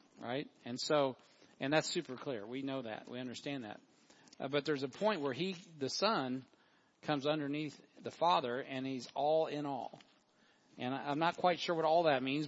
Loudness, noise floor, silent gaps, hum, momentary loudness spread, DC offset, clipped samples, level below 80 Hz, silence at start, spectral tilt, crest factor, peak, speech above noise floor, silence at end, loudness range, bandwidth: -37 LUFS; -70 dBFS; none; none; 13 LU; under 0.1%; under 0.1%; -88 dBFS; 0.2 s; -3.5 dB/octave; 22 dB; -16 dBFS; 34 dB; 0 s; 4 LU; 7.6 kHz